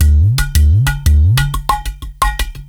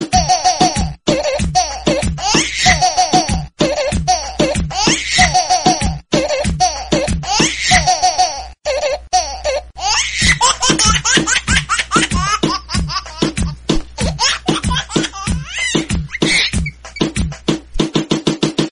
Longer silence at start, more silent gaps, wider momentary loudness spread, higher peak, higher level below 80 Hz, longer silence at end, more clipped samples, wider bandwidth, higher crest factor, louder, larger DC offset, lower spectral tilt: about the same, 0 s vs 0 s; neither; about the same, 7 LU vs 9 LU; about the same, 0 dBFS vs 0 dBFS; first, -14 dBFS vs -28 dBFS; about the same, 0.05 s vs 0 s; neither; first, 19 kHz vs 11 kHz; second, 10 dB vs 16 dB; about the same, -14 LUFS vs -15 LUFS; second, under 0.1% vs 0.4%; first, -4.5 dB/octave vs -3 dB/octave